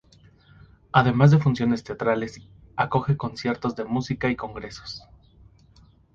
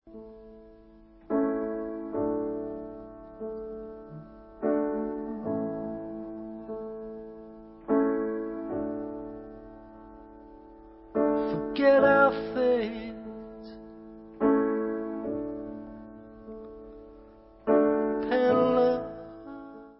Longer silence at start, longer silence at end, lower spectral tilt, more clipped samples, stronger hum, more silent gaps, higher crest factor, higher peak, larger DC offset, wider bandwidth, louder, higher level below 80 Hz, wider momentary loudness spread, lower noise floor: first, 0.95 s vs 0.05 s; first, 1.15 s vs 0.05 s; second, -7.5 dB/octave vs -10 dB/octave; neither; neither; neither; about the same, 22 dB vs 20 dB; first, -2 dBFS vs -10 dBFS; neither; first, 7.4 kHz vs 5.8 kHz; first, -23 LUFS vs -28 LUFS; first, -52 dBFS vs -58 dBFS; second, 19 LU vs 24 LU; about the same, -55 dBFS vs -54 dBFS